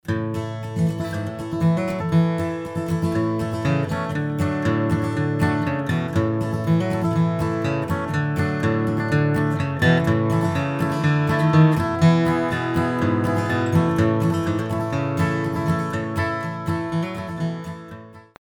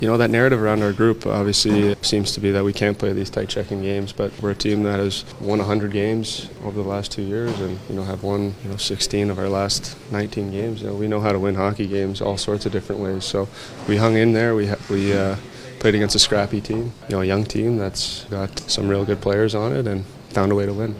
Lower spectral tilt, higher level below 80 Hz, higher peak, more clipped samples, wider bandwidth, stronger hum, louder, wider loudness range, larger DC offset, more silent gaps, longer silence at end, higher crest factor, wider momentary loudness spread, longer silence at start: first, -7.5 dB/octave vs -5 dB/octave; about the same, -48 dBFS vs -44 dBFS; second, -4 dBFS vs 0 dBFS; neither; about the same, 17 kHz vs 15.5 kHz; neither; about the same, -22 LUFS vs -21 LUFS; about the same, 4 LU vs 5 LU; neither; neither; first, 0.25 s vs 0 s; about the same, 18 dB vs 20 dB; about the same, 8 LU vs 10 LU; about the same, 0.05 s vs 0 s